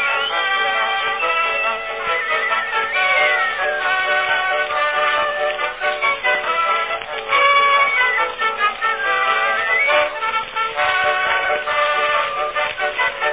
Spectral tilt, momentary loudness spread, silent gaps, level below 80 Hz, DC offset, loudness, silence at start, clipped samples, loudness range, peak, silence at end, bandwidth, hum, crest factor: -4 dB/octave; 6 LU; none; -54 dBFS; under 0.1%; -17 LUFS; 0 s; under 0.1%; 2 LU; -2 dBFS; 0 s; 4 kHz; none; 16 dB